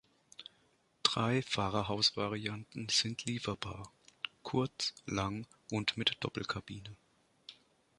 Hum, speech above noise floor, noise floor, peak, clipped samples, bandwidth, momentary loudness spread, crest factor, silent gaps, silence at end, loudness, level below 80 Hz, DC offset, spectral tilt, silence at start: none; 36 dB; -72 dBFS; -8 dBFS; under 0.1%; 11.5 kHz; 23 LU; 30 dB; none; 0.45 s; -35 LUFS; -62 dBFS; under 0.1%; -3.5 dB/octave; 0.4 s